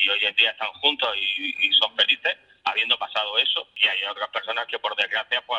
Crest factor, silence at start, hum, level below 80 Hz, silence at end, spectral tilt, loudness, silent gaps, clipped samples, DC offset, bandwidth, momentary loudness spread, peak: 20 dB; 0 s; none; -74 dBFS; 0 s; -0.5 dB/octave; -21 LUFS; none; under 0.1%; under 0.1%; 12.5 kHz; 9 LU; -4 dBFS